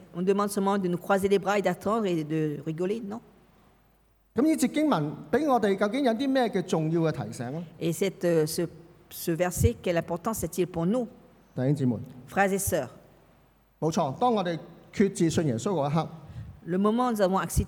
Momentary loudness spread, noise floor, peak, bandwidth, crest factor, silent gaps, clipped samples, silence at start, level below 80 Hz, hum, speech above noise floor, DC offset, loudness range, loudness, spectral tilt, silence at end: 11 LU; -64 dBFS; -10 dBFS; 19 kHz; 18 dB; none; under 0.1%; 0 s; -50 dBFS; none; 37 dB; under 0.1%; 3 LU; -27 LUFS; -6 dB/octave; 0 s